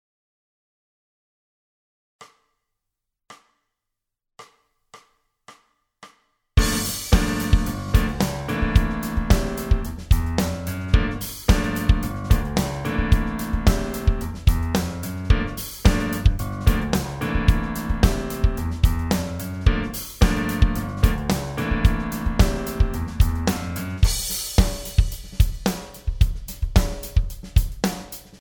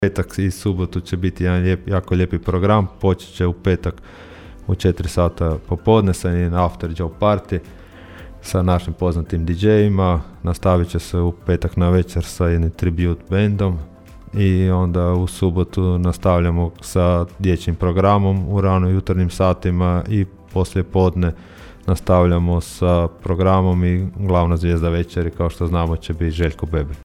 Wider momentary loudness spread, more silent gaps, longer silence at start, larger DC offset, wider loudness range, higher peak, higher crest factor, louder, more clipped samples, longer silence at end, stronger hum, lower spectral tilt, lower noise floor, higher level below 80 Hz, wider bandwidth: second, 5 LU vs 8 LU; neither; first, 2.2 s vs 0 s; neither; about the same, 2 LU vs 2 LU; about the same, -2 dBFS vs -2 dBFS; first, 20 dB vs 14 dB; second, -23 LUFS vs -19 LUFS; neither; about the same, 0.05 s vs 0 s; neither; second, -5.5 dB/octave vs -7.5 dB/octave; first, -83 dBFS vs -38 dBFS; first, -24 dBFS vs -30 dBFS; first, over 20 kHz vs 13 kHz